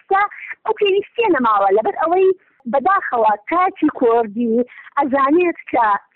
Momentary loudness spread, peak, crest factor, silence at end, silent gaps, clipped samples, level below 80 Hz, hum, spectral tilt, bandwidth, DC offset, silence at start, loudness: 7 LU; -8 dBFS; 10 dB; 0.15 s; none; under 0.1%; -58 dBFS; none; -8 dB/octave; 4.2 kHz; under 0.1%; 0.1 s; -17 LUFS